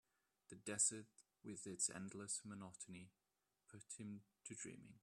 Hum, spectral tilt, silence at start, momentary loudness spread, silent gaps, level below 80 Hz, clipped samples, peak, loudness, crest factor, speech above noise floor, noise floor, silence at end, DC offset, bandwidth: none; -2.5 dB/octave; 0.5 s; 24 LU; none; -88 dBFS; under 0.1%; -26 dBFS; -47 LUFS; 26 dB; 31 dB; -81 dBFS; 0.05 s; under 0.1%; 14 kHz